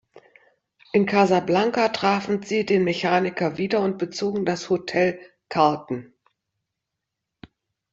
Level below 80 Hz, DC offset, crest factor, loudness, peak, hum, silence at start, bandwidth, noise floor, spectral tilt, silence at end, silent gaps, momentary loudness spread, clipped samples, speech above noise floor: -64 dBFS; under 0.1%; 20 dB; -22 LUFS; -4 dBFS; none; 0.95 s; 7.8 kHz; -83 dBFS; -5.5 dB/octave; 1.85 s; none; 7 LU; under 0.1%; 61 dB